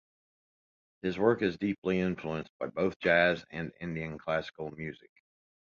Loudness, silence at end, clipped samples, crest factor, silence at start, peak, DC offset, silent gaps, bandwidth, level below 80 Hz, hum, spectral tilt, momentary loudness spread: -31 LUFS; 0.75 s; under 0.1%; 22 dB; 1.05 s; -12 dBFS; under 0.1%; 1.78-1.82 s, 2.50-2.60 s, 2.96-3.00 s; 7.2 kHz; -60 dBFS; none; -7 dB/octave; 14 LU